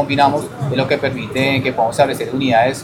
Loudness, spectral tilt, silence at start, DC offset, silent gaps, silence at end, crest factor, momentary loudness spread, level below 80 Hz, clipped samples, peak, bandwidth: -17 LUFS; -5.5 dB/octave; 0 s; under 0.1%; none; 0 s; 16 dB; 6 LU; -48 dBFS; under 0.1%; 0 dBFS; 17 kHz